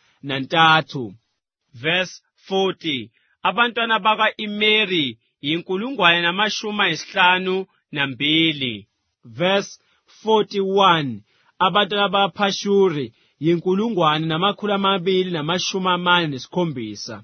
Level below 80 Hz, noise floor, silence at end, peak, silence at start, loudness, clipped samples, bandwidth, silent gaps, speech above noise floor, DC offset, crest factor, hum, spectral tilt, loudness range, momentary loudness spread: -66 dBFS; -74 dBFS; 0 s; 0 dBFS; 0.25 s; -19 LUFS; under 0.1%; 6.6 kHz; none; 55 dB; under 0.1%; 20 dB; none; -4.5 dB/octave; 3 LU; 12 LU